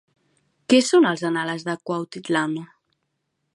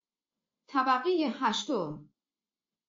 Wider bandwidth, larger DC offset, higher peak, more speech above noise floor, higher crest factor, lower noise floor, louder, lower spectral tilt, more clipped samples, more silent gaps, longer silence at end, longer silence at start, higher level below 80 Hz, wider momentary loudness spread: first, 11.5 kHz vs 7.4 kHz; neither; first, -4 dBFS vs -16 dBFS; second, 55 dB vs over 61 dB; about the same, 18 dB vs 18 dB; second, -76 dBFS vs under -90 dBFS; first, -21 LUFS vs -30 LUFS; first, -4.5 dB/octave vs -2.5 dB/octave; neither; neither; about the same, 0.9 s vs 0.85 s; about the same, 0.7 s vs 0.7 s; first, -76 dBFS vs -82 dBFS; about the same, 12 LU vs 10 LU